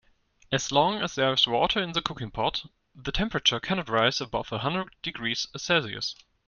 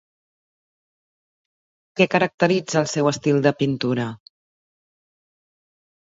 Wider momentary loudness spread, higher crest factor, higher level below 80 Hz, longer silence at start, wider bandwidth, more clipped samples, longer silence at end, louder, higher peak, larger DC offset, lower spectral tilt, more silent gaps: first, 10 LU vs 7 LU; about the same, 22 dB vs 22 dB; first, -48 dBFS vs -66 dBFS; second, 0.5 s vs 1.95 s; first, 10 kHz vs 8 kHz; neither; second, 0.35 s vs 1.95 s; second, -27 LUFS vs -21 LUFS; second, -6 dBFS vs -2 dBFS; neither; second, -3.5 dB/octave vs -5.5 dB/octave; second, none vs 2.34-2.38 s